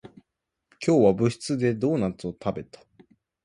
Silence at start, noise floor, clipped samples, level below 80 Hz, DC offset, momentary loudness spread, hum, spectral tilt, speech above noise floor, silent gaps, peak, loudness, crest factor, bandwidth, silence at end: 0.05 s; -81 dBFS; under 0.1%; -56 dBFS; under 0.1%; 12 LU; none; -7 dB/octave; 57 dB; none; -6 dBFS; -25 LUFS; 20 dB; 11.5 kHz; 0.8 s